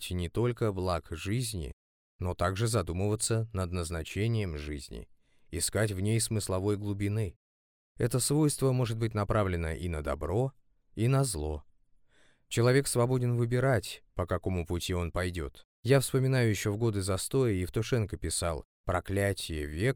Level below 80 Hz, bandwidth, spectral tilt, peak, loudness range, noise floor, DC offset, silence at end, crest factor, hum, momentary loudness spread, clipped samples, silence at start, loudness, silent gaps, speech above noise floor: -46 dBFS; 18 kHz; -5.5 dB/octave; -12 dBFS; 3 LU; -63 dBFS; under 0.1%; 0 s; 18 dB; none; 11 LU; under 0.1%; 0 s; -31 LUFS; 1.73-2.19 s, 7.36-7.95 s, 15.65-15.83 s, 18.65-18.84 s; 33 dB